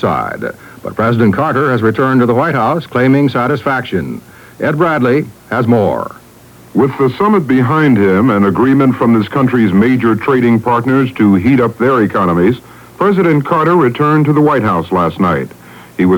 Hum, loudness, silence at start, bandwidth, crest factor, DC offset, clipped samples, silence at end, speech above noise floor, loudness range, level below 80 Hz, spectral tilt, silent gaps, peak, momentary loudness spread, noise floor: none; -12 LUFS; 0 s; 19.5 kHz; 12 dB; under 0.1%; under 0.1%; 0 s; 28 dB; 3 LU; -46 dBFS; -8.5 dB/octave; none; 0 dBFS; 9 LU; -39 dBFS